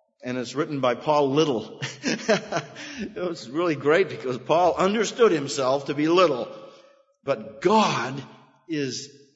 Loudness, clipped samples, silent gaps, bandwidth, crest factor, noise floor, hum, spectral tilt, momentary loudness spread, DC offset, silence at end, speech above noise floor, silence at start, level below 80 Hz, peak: -24 LUFS; under 0.1%; none; 8 kHz; 20 dB; -56 dBFS; none; -4.5 dB/octave; 13 LU; under 0.1%; 0.3 s; 32 dB; 0.25 s; -66 dBFS; -4 dBFS